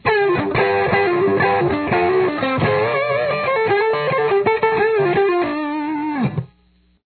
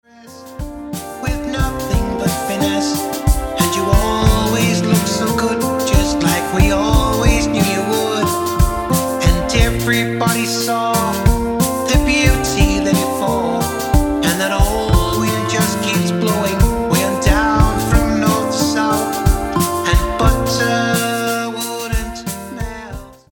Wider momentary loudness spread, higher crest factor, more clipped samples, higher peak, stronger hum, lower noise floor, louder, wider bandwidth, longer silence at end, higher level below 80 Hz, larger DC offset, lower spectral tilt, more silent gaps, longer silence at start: about the same, 6 LU vs 7 LU; about the same, 14 dB vs 16 dB; neither; second, -4 dBFS vs 0 dBFS; neither; first, -57 dBFS vs -37 dBFS; about the same, -18 LUFS vs -16 LUFS; second, 4.6 kHz vs 19.5 kHz; first, 0.6 s vs 0.2 s; second, -50 dBFS vs -22 dBFS; neither; first, -10 dB/octave vs -5 dB/octave; neither; second, 0.05 s vs 0.25 s